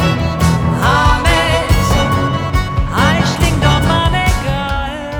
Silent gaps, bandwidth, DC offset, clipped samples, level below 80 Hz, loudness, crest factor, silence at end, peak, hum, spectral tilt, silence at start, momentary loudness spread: none; over 20 kHz; under 0.1%; under 0.1%; -20 dBFS; -13 LUFS; 12 dB; 0 s; 0 dBFS; none; -5 dB/octave; 0 s; 6 LU